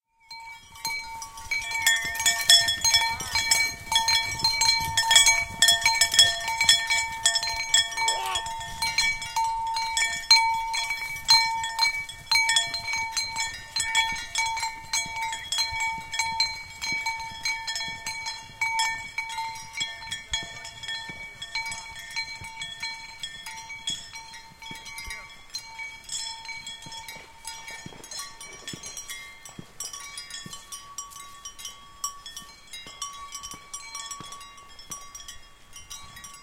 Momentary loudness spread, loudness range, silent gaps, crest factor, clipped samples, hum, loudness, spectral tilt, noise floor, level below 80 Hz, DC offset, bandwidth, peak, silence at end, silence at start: 21 LU; 18 LU; none; 26 dB; under 0.1%; none; -23 LUFS; 1.5 dB/octave; -47 dBFS; -52 dBFS; under 0.1%; 17 kHz; -2 dBFS; 0 s; 0.3 s